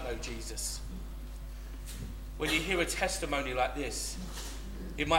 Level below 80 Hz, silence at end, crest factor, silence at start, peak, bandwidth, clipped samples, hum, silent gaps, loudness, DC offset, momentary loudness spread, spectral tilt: -42 dBFS; 0 s; 22 dB; 0 s; -12 dBFS; 16.5 kHz; under 0.1%; none; none; -35 LUFS; under 0.1%; 15 LU; -3 dB/octave